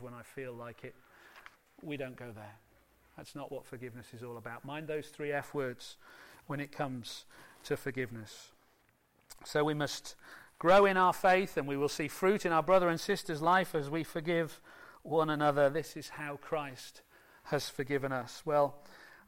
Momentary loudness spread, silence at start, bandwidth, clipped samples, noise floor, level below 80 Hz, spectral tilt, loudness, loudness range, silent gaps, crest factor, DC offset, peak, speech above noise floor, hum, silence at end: 22 LU; 0 s; 16.5 kHz; under 0.1%; -71 dBFS; -66 dBFS; -5 dB/octave; -33 LUFS; 17 LU; none; 18 dB; under 0.1%; -16 dBFS; 37 dB; none; 0.2 s